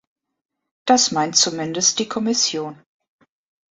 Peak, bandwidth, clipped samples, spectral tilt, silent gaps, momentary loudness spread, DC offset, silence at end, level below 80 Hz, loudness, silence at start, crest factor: -2 dBFS; 8.4 kHz; under 0.1%; -2 dB/octave; none; 12 LU; under 0.1%; 0.95 s; -66 dBFS; -18 LUFS; 0.85 s; 20 dB